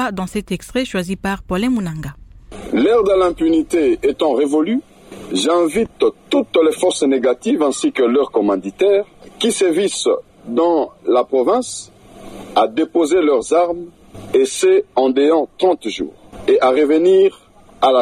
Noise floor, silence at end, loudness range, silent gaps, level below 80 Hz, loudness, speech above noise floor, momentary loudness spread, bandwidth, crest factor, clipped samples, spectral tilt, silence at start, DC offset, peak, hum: -36 dBFS; 0 s; 2 LU; none; -46 dBFS; -16 LUFS; 21 dB; 10 LU; 14 kHz; 12 dB; under 0.1%; -4.5 dB/octave; 0 s; under 0.1%; -4 dBFS; none